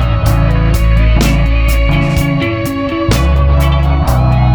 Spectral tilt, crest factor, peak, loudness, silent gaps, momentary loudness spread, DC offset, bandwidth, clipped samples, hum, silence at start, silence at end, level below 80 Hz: -6.5 dB/octave; 10 dB; 0 dBFS; -12 LUFS; none; 3 LU; under 0.1%; 19.5 kHz; under 0.1%; none; 0 s; 0 s; -12 dBFS